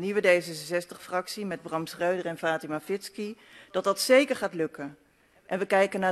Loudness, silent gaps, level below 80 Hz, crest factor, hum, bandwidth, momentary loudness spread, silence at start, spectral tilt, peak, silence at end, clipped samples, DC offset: -28 LUFS; none; -74 dBFS; 20 dB; none; 14 kHz; 15 LU; 0 s; -4 dB/octave; -8 dBFS; 0 s; under 0.1%; under 0.1%